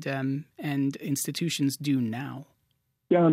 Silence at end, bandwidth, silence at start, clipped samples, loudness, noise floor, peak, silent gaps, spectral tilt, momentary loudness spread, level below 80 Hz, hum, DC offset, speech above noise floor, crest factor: 0 s; 16 kHz; 0 s; under 0.1%; -29 LUFS; -74 dBFS; -12 dBFS; none; -5.5 dB/octave; 8 LU; -78 dBFS; none; under 0.1%; 45 dB; 16 dB